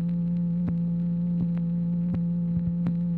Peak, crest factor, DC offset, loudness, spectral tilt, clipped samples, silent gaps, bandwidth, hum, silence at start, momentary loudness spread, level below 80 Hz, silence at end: -16 dBFS; 10 dB; under 0.1%; -27 LUFS; -13 dB/octave; under 0.1%; none; 2.2 kHz; none; 0 s; 0 LU; -48 dBFS; 0 s